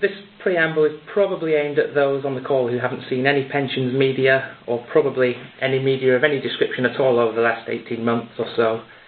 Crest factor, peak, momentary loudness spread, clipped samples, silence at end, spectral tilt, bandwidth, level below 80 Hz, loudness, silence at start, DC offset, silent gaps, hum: 20 dB; 0 dBFS; 7 LU; under 0.1%; 0.15 s; -11 dB/octave; 4.6 kHz; -64 dBFS; -20 LUFS; 0 s; under 0.1%; none; none